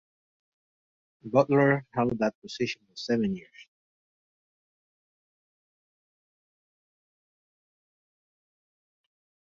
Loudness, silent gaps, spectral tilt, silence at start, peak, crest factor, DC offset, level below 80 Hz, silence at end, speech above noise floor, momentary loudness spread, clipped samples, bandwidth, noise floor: -27 LUFS; 2.35-2.42 s; -6.5 dB/octave; 1.25 s; -6 dBFS; 26 dB; under 0.1%; -68 dBFS; 5.95 s; over 63 dB; 13 LU; under 0.1%; 7.6 kHz; under -90 dBFS